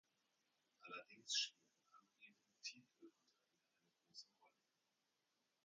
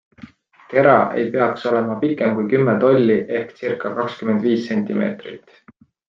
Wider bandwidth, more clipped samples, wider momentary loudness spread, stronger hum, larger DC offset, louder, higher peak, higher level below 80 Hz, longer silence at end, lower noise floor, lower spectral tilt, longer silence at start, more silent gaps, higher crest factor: first, 9 kHz vs 7.2 kHz; neither; first, 25 LU vs 10 LU; neither; neither; second, -48 LUFS vs -18 LUFS; second, -30 dBFS vs -2 dBFS; second, under -90 dBFS vs -62 dBFS; first, 1.15 s vs 0.7 s; first, -88 dBFS vs -44 dBFS; second, 1.5 dB/octave vs -8.5 dB/octave; first, 0.85 s vs 0.25 s; neither; first, 28 dB vs 18 dB